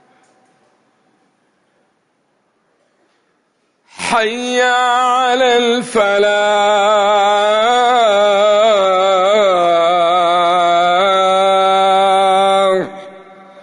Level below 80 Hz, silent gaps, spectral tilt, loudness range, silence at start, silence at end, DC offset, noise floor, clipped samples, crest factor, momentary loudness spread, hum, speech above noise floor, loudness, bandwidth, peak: -60 dBFS; none; -3 dB/octave; 7 LU; 4 s; 0 s; under 0.1%; -62 dBFS; under 0.1%; 10 dB; 4 LU; none; 49 dB; -12 LUFS; 11 kHz; -2 dBFS